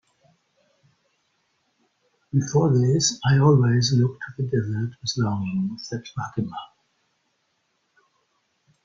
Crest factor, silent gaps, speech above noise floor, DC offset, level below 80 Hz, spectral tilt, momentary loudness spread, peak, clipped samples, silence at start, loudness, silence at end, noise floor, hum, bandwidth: 20 dB; none; 50 dB; under 0.1%; -58 dBFS; -5.5 dB/octave; 13 LU; -4 dBFS; under 0.1%; 2.35 s; -23 LUFS; 2.2 s; -71 dBFS; none; 7.6 kHz